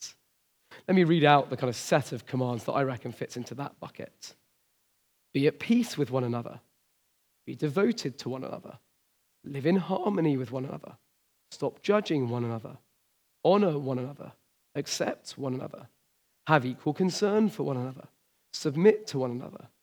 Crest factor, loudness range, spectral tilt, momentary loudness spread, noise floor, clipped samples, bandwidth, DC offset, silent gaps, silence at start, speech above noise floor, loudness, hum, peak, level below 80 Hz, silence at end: 24 dB; 6 LU; -6 dB/octave; 20 LU; -72 dBFS; under 0.1%; 20 kHz; under 0.1%; none; 0 s; 44 dB; -29 LUFS; none; -6 dBFS; -82 dBFS; 0.15 s